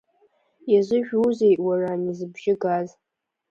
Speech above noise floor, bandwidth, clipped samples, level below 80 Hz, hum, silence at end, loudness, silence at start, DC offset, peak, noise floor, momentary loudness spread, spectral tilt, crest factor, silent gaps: 42 dB; 7.4 kHz; under 0.1%; -68 dBFS; none; 0.65 s; -22 LUFS; 0.65 s; under 0.1%; -8 dBFS; -64 dBFS; 10 LU; -7.5 dB/octave; 16 dB; none